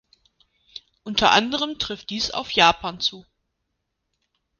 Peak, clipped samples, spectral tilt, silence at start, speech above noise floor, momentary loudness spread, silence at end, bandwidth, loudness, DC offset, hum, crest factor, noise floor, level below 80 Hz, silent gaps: 0 dBFS; under 0.1%; -2.5 dB/octave; 0.75 s; 56 dB; 22 LU; 1.4 s; 10 kHz; -21 LUFS; under 0.1%; none; 24 dB; -77 dBFS; -52 dBFS; none